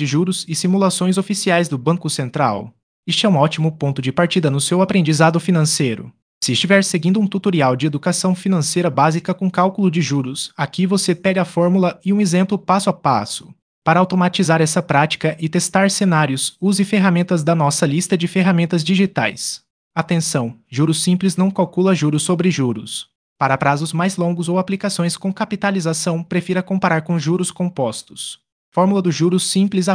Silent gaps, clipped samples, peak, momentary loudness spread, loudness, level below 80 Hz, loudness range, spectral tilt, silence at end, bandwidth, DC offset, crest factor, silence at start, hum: 2.83-3.03 s, 6.22-6.41 s, 13.62-13.82 s, 19.70-19.91 s, 23.15-23.36 s, 28.52-28.72 s; under 0.1%; 0 dBFS; 7 LU; -17 LUFS; -60 dBFS; 3 LU; -5 dB/octave; 0 s; 10.5 kHz; under 0.1%; 16 dB; 0 s; none